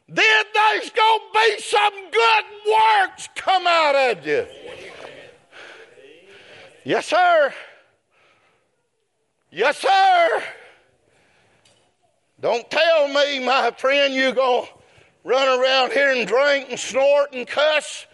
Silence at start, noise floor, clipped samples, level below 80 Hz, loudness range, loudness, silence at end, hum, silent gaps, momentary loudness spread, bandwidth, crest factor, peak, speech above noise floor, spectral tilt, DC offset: 0.1 s; -71 dBFS; under 0.1%; -74 dBFS; 6 LU; -18 LUFS; 0.1 s; none; none; 11 LU; 11.5 kHz; 18 dB; -2 dBFS; 53 dB; -1.5 dB/octave; under 0.1%